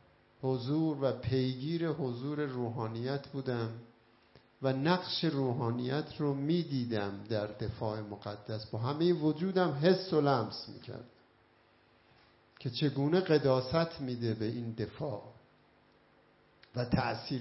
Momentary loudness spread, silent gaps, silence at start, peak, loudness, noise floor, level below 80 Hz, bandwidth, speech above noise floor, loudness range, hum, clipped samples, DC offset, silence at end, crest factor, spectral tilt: 11 LU; none; 0.4 s; -14 dBFS; -34 LUFS; -66 dBFS; -64 dBFS; 6 kHz; 33 dB; 5 LU; none; under 0.1%; under 0.1%; 0 s; 20 dB; -10 dB/octave